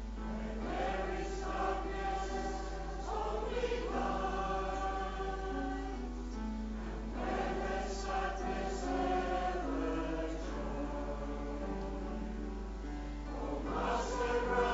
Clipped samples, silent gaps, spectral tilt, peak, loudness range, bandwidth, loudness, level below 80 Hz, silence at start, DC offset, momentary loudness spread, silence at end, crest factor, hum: under 0.1%; none; -4.5 dB/octave; -20 dBFS; 3 LU; 7.6 kHz; -38 LUFS; -42 dBFS; 0 s; under 0.1%; 7 LU; 0 s; 16 dB; none